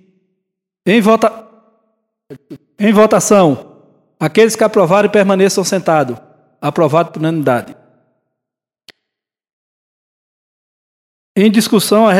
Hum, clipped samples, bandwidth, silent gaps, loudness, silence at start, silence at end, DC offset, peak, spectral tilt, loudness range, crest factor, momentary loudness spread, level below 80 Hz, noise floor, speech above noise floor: none; 0.1%; 16 kHz; 9.53-11.35 s; -12 LUFS; 0.85 s; 0 s; under 0.1%; 0 dBFS; -5 dB/octave; 9 LU; 14 dB; 11 LU; -62 dBFS; -83 dBFS; 72 dB